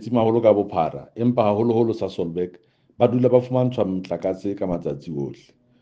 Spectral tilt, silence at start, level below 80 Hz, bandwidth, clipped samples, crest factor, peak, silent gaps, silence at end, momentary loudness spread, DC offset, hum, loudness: -9 dB/octave; 0 s; -58 dBFS; 7.4 kHz; under 0.1%; 20 dB; -2 dBFS; none; 0.45 s; 12 LU; under 0.1%; none; -22 LUFS